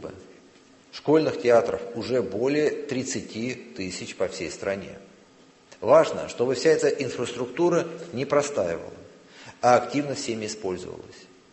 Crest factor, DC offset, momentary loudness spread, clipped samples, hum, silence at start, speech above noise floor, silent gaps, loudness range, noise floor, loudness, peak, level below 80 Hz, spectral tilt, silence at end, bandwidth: 22 dB; under 0.1%; 14 LU; under 0.1%; none; 0 s; 30 dB; none; 5 LU; -55 dBFS; -25 LUFS; -4 dBFS; -60 dBFS; -5 dB/octave; 0.3 s; 8.6 kHz